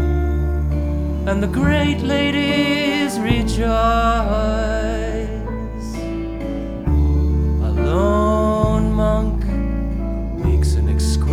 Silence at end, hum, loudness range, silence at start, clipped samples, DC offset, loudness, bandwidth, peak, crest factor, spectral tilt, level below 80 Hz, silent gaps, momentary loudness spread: 0 s; none; 4 LU; 0 s; under 0.1%; under 0.1%; -19 LUFS; 13 kHz; 0 dBFS; 16 dB; -6.5 dB/octave; -22 dBFS; none; 9 LU